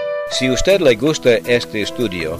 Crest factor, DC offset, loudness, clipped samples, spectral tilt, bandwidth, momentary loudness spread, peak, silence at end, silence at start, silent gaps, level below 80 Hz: 14 dB; under 0.1%; -16 LUFS; under 0.1%; -4 dB/octave; 15.5 kHz; 8 LU; -2 dBFS; 0 s; 0 s; none; -36 dBFS